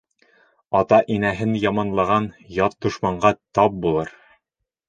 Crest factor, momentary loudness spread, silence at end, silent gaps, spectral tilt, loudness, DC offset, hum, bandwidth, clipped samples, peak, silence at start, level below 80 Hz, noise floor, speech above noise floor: 20 dB; 7 LU; 0.8 s; none; -7 dB/octave; -20 LUFS; under 0.1%; none; 9.2 kHz; under 0.1%; 0 dBFS; 0.7 s; -50 dBFS; -81 dBFS; 61 dB